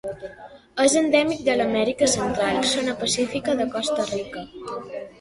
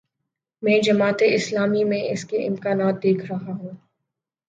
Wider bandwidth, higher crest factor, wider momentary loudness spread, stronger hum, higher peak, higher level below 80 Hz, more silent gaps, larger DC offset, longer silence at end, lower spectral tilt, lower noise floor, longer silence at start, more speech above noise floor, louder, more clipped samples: first, 11.5 kHz vs 9.2 kHz; about the same, 18 dB vs 16 dB; first, 15 LU vs 12 LU; neither; about the same, -4 dBFS vs -6 dBFS; first, -54 dBFS vs -68 dBFS; neither; neither; second, 0.1 s vs 0.7 s; second, -3 dB/octave vs -5.5 dB/octave; second, -44 dBFS vs -82 dBFS; second, 0.05 s vs 0.6 s; second, 22 dB vs 61 dB; about the same, -22 LUFS vs -21 LUFS; neither